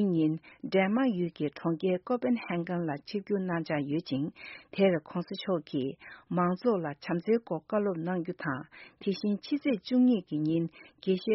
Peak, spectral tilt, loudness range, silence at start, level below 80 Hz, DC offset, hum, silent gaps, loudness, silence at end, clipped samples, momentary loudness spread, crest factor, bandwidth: -12 dBFS; -6 dB/octave; 2 LU; 0 s; -72 dBFS; under 0.1%; none; none; -31 LUFS; 0 s; under 0.1%; 10 LU; 18 dB; 5.8 kHz